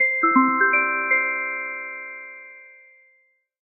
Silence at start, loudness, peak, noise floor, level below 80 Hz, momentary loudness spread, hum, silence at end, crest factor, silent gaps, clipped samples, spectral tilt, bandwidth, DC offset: 0 s; -20 LUFS; -4 dBFS; -64 dBFS; under -90 dBFS; 20 LU; none; 0.95 s; 20 dB; none; under 0.1%; -4 dB/octave; 3.1 kHz; under 0.1%